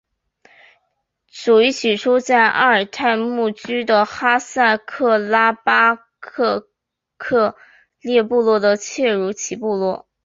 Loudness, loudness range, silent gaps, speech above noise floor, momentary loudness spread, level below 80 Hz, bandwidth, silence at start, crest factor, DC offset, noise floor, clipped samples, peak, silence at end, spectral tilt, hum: -17 LUFS; 3 LU; none; 62 dB; 9 LU; -64 dBFS; 7.8 kHz; 1.35 s; 16 dB; under 0.1%; -79 dBFS; under 0.1%; -2 dBFS; 0.25 s; -3.5 dB/octave; none